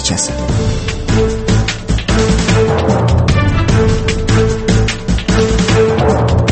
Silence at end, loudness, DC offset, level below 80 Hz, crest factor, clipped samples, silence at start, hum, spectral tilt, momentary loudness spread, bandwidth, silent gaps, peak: 0 s; -13 LUFS; under 0.1%; -20 dBFS; 12 dB; under 0.1%; 0 s; none; -5.5 dB/octave; 4 LU; 8.8 kHz; none; 0 dBFS